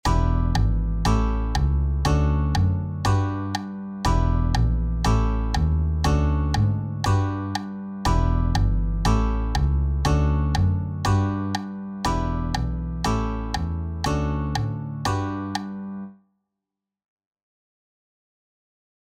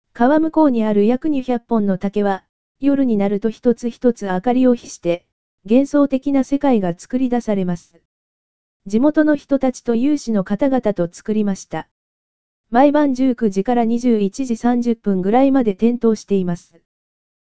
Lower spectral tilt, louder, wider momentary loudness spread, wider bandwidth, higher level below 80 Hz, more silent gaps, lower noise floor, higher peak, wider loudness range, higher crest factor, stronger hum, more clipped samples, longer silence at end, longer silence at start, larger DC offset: about the same, -6.5 dB/octave vs -7 dB/octave; second, -24 LUFS vs -18 LUFS; about the same, 7 LU vs 7 LU; first, 13 kHz vs 8 kHz; first, -26 dBFS vs -50 dBFS; second, none vs 2.49-2.75 s, 5.32-5.58 s, 8.05-8.80 s, 11.91-12.64 s; second, -86 dBFS vs under -90 dBFS; second, -8 dBFS vs 0 dBFS; first, 7 LU vs 3 LU; about the same, 14 dB vs 16 dB; neither; neither; first, 2.9 s vs 0.7 s; about the same, 0.05 s vs 0.05 s; second, under 0.1% vs 2%